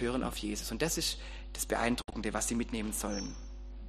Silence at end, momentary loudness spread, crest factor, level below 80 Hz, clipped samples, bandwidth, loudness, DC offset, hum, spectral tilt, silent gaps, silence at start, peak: 0 s; 11 LU; 22 dB; -44 dBFS; under 0.1%; 15 kHz; -35 LUFS; under 0.1%; none; -3.5 dB/octave; none; 0 s; -14 dBFS